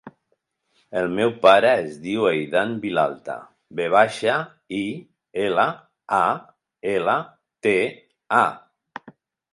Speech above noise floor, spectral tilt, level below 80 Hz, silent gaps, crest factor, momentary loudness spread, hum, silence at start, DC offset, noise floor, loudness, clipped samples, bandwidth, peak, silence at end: 51 dB; -5 dB/octave; -64 dBFS; none; 20 dB; 17 LU; none; 0.05 s; under 0.1%; -72 dBFS; -21 LUFS; under 0.1%; 11.5 kHz; -2 dBFS; 0.45 s